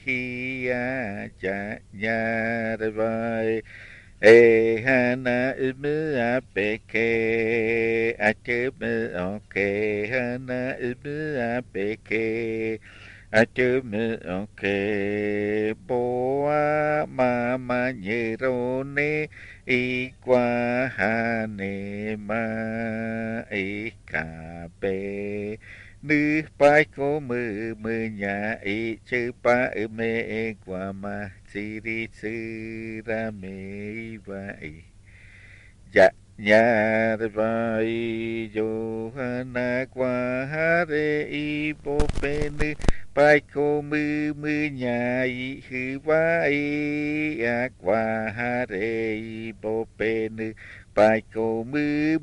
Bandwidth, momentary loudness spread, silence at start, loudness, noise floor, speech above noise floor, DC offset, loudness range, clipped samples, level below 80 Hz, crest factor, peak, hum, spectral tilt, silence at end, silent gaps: 11 kHz; 12 LU; 0.05 s; -25 LUFS; -49 dBFS; 24 dB; under 0.1%; 9 LU; under 0.1%; -44 dBFS; 22 dB; -2 dBFS; none; -7 dB/octave; 0 s; none